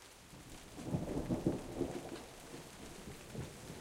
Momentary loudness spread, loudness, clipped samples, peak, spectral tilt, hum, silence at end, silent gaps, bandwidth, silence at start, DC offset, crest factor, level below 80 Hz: 15 LU; -44 LUFS; under 0.1%; -20 dBFS; -6 dB/octave; none; 0 s; none; 16 kHz; 0 s; under 0.1%; 24 dB; -56 dBFS